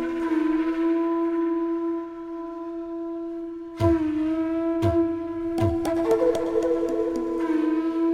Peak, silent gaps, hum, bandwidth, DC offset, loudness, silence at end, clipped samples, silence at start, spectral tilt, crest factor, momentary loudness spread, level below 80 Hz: -8 dBFS; none; none; 10.5 kHz; under 0.1%; -25 LUFS; 0 s; under 0.1%; 0 s; -8 dB/octave; 16 dB; 11 LU; -46 dBFS